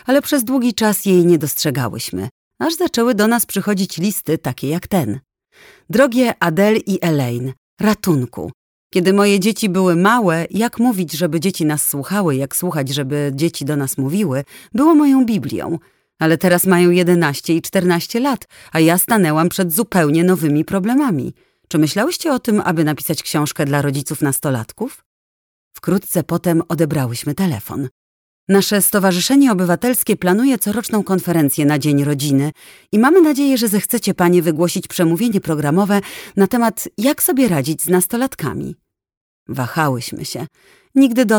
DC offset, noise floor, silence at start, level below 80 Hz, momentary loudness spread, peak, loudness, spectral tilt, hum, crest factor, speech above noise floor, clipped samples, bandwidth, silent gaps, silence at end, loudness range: under 0.1%; under -90 dBFS; 0.05 s; -54 dBFS; 11 LU; 0 dBFS; -16 LUFS; -5 dB/octave; none; 16 dB; over 74 dB; under 0.1%; over 20 kHz; 2.31-2.51 s, 7.58-7.77 s, 8.54-8.90 s, 25.06-25.71 s, 27.91-28.47 s, 39.17-39.46 s; 0 s; 5 LU